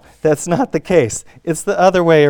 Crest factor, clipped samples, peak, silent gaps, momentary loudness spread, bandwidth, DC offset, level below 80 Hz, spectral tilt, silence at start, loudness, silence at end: 14 dB; under 0.1%; 0 dBFS; none; 9 LU; 18 kHz; under 0.1%; -46 dBFS; -5.5 dB/octave; 0.25 s; -16 LUFS; 0 s